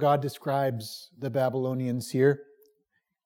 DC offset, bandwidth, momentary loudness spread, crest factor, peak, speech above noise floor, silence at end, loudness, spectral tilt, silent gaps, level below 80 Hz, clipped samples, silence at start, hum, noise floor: under 0.1%; 17.5 kHz; 11 LU; 18 dB; -10 dBFS; 49 dB; 0.8 s; -28 LUFS; -6.5 dB/octave; none; -82 dBFS; under 0.1%; 0 s; none; -76 dBFS